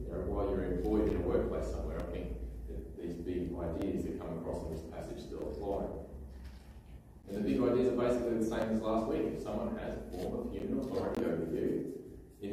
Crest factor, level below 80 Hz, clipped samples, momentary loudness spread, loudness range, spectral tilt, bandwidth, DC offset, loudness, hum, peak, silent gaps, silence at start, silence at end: 18 dB; -46 dBFS; under 0.1%; 14 LU; 6 LU; -7.5 dB/octave; 15.5 kHz; under 0.1%; -36 LUFS; none; -18 dBFS; none; 0 s; 0 s